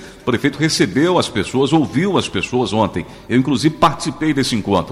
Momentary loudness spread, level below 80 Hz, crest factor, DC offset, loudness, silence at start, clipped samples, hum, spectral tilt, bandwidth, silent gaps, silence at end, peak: 4 LU; -46 dBFS; 14 dB; under 0.1%; -17 LUFS; 0 s; under 0.1%; none; -5 dB/octave; 15 kHz; none; 0 s; -2 dBFS